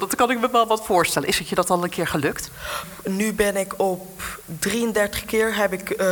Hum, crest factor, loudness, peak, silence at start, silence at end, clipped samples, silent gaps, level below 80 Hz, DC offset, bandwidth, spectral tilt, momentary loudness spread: none; 18 dB; -22 LUFS; -6 dBFS; 0 s; 0 s; under 0.1%; none; -48 dBFS; under 0.1%; 19 kHz; -3.5 dB/octave; 11 LU